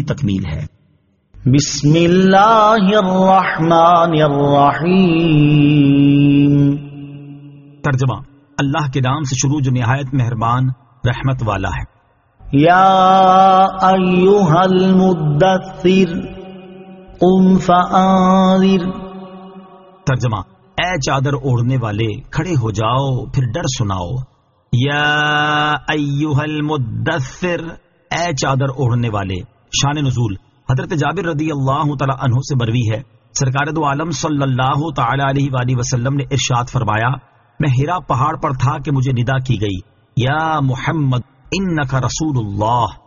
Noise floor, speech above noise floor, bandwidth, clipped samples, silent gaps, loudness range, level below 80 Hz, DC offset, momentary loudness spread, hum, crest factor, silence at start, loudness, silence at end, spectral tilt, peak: -57 dBFS; 43 dB; 7.4 kHz; under 0.1%; none; 7 LU; -40 dBFS; under 0.1%; 12 LU; none; 14 dB; 0 s; -15 LUFS; 0.1 s; -5.5 dB/octave; 0 dBFS